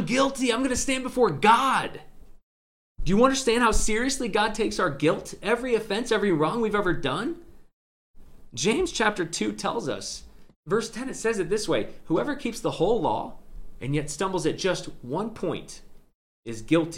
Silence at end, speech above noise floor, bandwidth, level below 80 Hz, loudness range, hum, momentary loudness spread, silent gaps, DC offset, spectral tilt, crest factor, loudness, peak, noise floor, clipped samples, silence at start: 0 s; over 65 dB; 16 kHz; -40 dBFS; 5 LU; none; 14 LU; 2.43-2.95 s, 7.73-8.14 s, 10.56-10.63 s, 16.15-16.43 s; under 0.1%; -4 dB/octave; 20 dB; -25 LUFS; -6 dBFS; under -90 dBFS; under 0.1%; 0 s